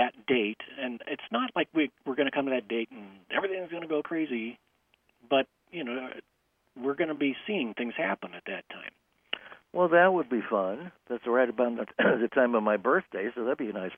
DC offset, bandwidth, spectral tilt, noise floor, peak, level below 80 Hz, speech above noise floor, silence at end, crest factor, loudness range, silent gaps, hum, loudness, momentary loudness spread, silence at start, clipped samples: under 0.1%; 3.7 kHz; -8 dB/octave; -74 dBFS; -10 dBFS; -76 dBFS; 45 dB; 0 s; 20 dB; 7 LU; none; none; -29 LUFS; 13 LU; 0 s; under 0.1%